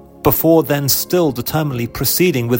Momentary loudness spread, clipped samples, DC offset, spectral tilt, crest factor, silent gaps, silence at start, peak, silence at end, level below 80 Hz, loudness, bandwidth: 7 LU; under 0.1%; under 0.1%; -5 dB/octave; 16 dB; none; 0.25 s; 0 dBFS; 0 s; -40 dBFS; -15 LUFS; 16.5 kHz